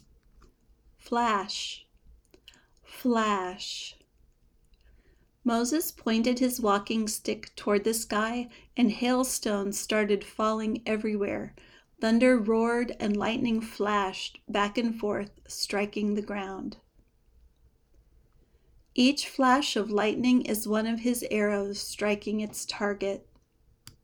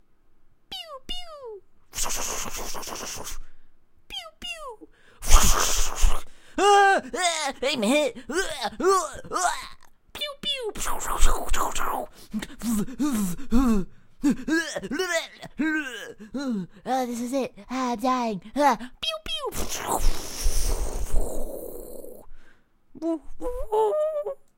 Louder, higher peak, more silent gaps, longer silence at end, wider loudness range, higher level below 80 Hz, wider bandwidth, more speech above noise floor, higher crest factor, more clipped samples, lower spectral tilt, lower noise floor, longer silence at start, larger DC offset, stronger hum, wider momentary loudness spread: about the same, -28 LUFS vs -26 LUFS; second, -10 dBFS vs 0 dBFS; neither; about the same, 0.15 s vs 0.2 s; second, 7 LU vs 10 LU; second, -58 dBFS vs -30 dBFS; first, over 20 kHz vs 16 kHz; first, 37 dB vs 28 dB; about the same, 20 dB vs 24 dB; neither; about the same, -4 dB/octave vs -3 dB/octave; first, -65 dBFS vs -53 dBFS; first, 1.05 s vs 0.7 s; neither; neither; second, 10 LU vs 14 LU